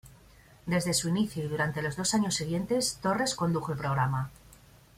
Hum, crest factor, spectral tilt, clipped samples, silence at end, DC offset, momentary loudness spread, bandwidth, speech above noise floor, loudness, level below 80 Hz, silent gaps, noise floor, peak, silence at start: none; 16 dB; -4.5 dB/octave; under 0.1%; 0.6 s; under 0.1%; 4 LU; 16 kHz; 27 dB; -29 LUFS; -56 dBFS; none; -56 dBFS; -14 dBFS; 0.05 s